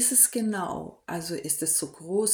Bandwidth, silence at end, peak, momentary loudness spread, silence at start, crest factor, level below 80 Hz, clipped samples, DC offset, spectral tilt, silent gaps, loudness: over 20 kHz; 0 s; -6 dBFS; 15 LU; 0 s; 20 dB; -64 dBFS; under 0.1%; under 0.1%; -2.5 dB/octave; none; -25 LUFS